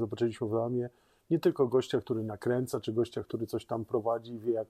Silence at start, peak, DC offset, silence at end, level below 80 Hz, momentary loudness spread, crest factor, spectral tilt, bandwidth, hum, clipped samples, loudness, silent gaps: 0 s; -14 dBFS; under 0.1%; 0.05 s; -68 dBFS; 8 LU; 18 dB; -7 dB/octave; 15 kHz; none; under 0.1%; -32 LUFS; none